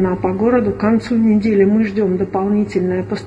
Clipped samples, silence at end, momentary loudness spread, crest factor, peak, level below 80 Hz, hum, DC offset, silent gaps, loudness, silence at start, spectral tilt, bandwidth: under 0.1%; 0 s; 5 LU; 14 dB; -2 dBFS; -42 dBFS; none; under 0.1%; none; -16 LUFS; 0 s; -8.5 dB/octave; 8.2 kHz